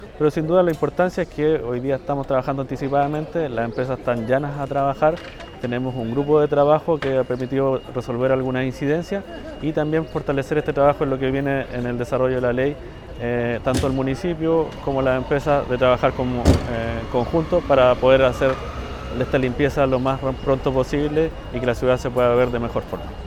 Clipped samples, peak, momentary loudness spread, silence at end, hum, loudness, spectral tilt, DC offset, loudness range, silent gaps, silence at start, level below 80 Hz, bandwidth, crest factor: under 0.1%; 0 dBFS; 8 LU; 0 s; none; -21 LUFS; -7 dB/octave; under 0.1%; 4 LU; none; 0 s; -38 dBFS; 15 kHz; 20 dB